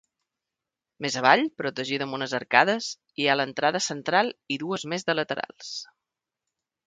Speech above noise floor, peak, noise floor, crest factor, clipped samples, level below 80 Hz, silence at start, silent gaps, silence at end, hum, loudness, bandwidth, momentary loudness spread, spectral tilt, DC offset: 62 dB; -2 dBFS; -88 dBFS; 26 dB; under 0.1%; -74 dBFS; 1 s; none; 1.05 s; none; -25 LUFS; 9.6 kHz; 13 LU; -3 dB/octave; under 0.1%